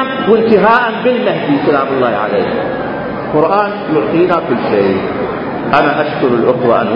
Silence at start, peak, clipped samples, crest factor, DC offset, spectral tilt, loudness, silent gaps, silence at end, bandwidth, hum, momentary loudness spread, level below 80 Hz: 0 s; 0 dBFS; under 0.1%; 12 dB; under 0.1%; -8.5 dB/octave; -12 LUFS; none; 0 s; 5.4 kHz; none; 8 LU; -44 dBFS